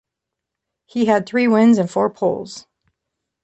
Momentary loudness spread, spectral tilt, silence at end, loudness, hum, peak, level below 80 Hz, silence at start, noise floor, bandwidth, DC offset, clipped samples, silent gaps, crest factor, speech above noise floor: 16 LU; -6.5 dB/octave; 0.85 s; -17 LUFS; none; -4 dBFS; -62 dBFS; 0.95 s; -82 dBFS; 8.2 kHz; under 0.1%; under 0.1%; none; 16 dB; 66 dB